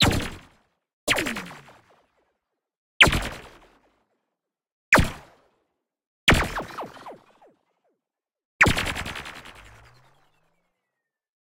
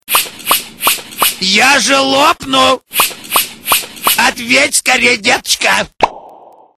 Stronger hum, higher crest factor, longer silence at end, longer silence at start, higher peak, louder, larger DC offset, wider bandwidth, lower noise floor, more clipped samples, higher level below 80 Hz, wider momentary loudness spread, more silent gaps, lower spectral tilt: neither; first, 26 dB vs 12 dB; first, 1.9 s vs 0.45 s; about the same, 0 s vs 0.1 s; about the same, -2 dBFS vs 0 dBFS; second, -22 LUFS vs -11 LUFS; neither; second, 17.5 kHz vs over 20 kHz; first, -87 dBFS vs -39 dBFS; second, under 0.1% vs 0.2%; first, -40 dBFS vs -46 dBFS; first, 25 LU vs 5 LU; first, 0.93-1.07 s, 2.77-3.00 s, 4.72-4.92 s, 6.07-6.27 s, 8.45-8.59 s vs none; first, -3.5 dB/octave vs -0.5 dB/octave